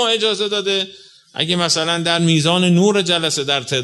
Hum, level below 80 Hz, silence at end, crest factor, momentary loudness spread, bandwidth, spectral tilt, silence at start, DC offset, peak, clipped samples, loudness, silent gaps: none; -60 dBFS; 0 s; 16 dB; 6 LU; 12 kHz; -4 dB/octave; 0 s; under 0.1%; 0 dBFS; under 0.1%; -16 LUFS; none